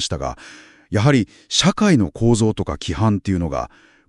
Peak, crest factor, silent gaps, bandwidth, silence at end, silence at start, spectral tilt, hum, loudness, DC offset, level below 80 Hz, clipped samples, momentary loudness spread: -2 dBFS; 18 dB; none; 11.5 kHz; 0.4 s; 0 s; -5 dB/octave; none; -19 LUFS; under 0.1%; -40 dBFS; under 0.1%; 11 LU